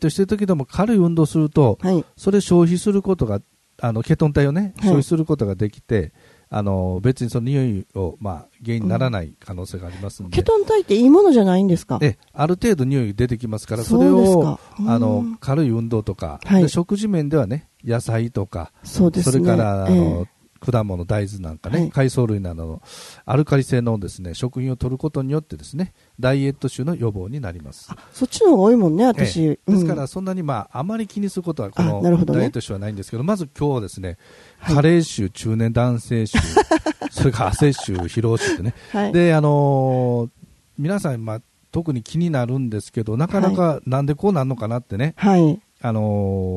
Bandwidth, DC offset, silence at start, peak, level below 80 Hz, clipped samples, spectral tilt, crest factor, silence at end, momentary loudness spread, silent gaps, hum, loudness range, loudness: 12.5 kHz; under 0.1%; 0 s; -2 dBFS; -42 dBFS; under 0.1%; -7.5 dB/octave; 16 dB; 0 s; 13 LU; none; none; 6 LU; -19 LUFS